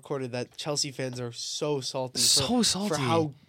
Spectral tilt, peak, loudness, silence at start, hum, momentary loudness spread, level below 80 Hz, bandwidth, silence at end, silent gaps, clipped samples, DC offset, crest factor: -3 dB/octave; -10 dBFS; -27 LUFS; 0.05 s; none; 13 LU; -60 dBFS; 16.5 kHz; 0.15 s; none; under 0.1%; under 0.1%; 18 dB